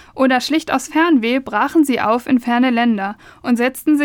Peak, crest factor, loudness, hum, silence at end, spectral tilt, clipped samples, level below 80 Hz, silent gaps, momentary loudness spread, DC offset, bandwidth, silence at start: -2 dBFS; 14 dB; -16 LUFS; none; 0 s; -4 dB/octave; under 0.1%; -56 dBFS; none; 5 LU; under 0.1%; 18 kHz; 0.15 s